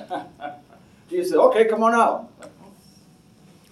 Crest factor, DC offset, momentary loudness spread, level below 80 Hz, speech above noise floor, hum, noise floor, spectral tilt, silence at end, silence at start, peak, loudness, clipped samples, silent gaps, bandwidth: 20 dB; under 0.1%; 20 LU; -68 dBFS; 34 dB; none; -52 dBFS; -5 dB/octave; 1.25 s; 0 s; -2 dBFS; -19 LUFS; under 0.1%; none; 13 kHz